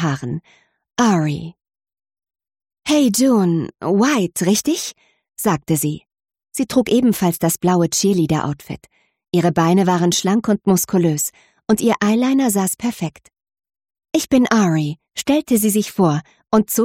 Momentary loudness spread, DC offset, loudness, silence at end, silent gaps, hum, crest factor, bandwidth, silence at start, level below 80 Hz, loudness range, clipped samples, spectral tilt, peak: 13 LU; under 0.1%; -17 LUFS; 0 s; none; none; 14 dB; 16.5 kHz; 0 s; -54 dBFS; 3 LU; under 0.1%; -5 dB/octave; -4 dBFS